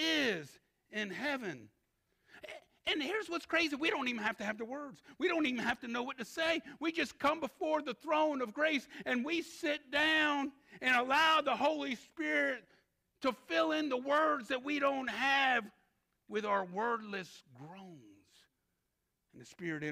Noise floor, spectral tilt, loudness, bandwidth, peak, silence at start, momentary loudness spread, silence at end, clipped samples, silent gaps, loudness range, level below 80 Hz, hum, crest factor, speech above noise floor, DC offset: -84 dBFS; -3.5 dB/octave; -34 LUFS; 15.5 kHz; -18 dBFS; 0 s; 15 LU; 0 s; under 0.1%; none; 8 LU; -74 dBFS; none; 18 dB; 49 dB; under 0.1%